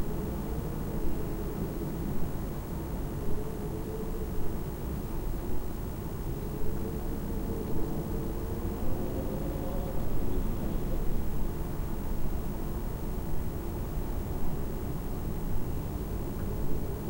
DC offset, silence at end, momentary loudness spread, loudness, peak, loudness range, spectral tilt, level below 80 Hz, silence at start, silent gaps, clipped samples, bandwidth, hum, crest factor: 0.1%; 0 s; 2 LU; -36 LUFS; -16 dBFS; 2 LU; -7.5 dB/octave; -34 dBFS; 0 s; none; under 0.1%; 16 kHz; none; 14 dB